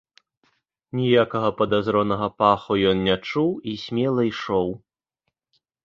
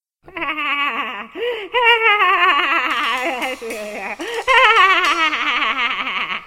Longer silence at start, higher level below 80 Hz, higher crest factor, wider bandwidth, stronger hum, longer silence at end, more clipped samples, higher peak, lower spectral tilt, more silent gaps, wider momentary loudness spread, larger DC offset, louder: first, 0.95 s vs 0.3 s; about the same, -54 dBFS vs -54 dBFS; about the same, 20 dB vs 18 dB; second, 7.2 kHz vs 16.5 kHz; neither; first, 1.05 s vs 0 s; neither; second, -4 dBFS vs 0 dBFS; first, -7.5 dB/octave vs -1 dB/octave; neither; second, 8 LU vs 15 LU; second, under 0.1% vs 0.1%; second, -22 LUFS vs -16 LUFS